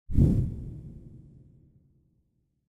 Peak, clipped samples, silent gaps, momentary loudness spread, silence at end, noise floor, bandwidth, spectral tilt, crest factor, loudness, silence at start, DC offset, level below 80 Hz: -10 dBFS; under 0.1%; none; 25 LU; 1.5 s; -73 dBFS; 7.4 kHz; -11 dB/octave; 20 dB; -27 LUFS; 0.1 s; under 0.1%; -36 dBFS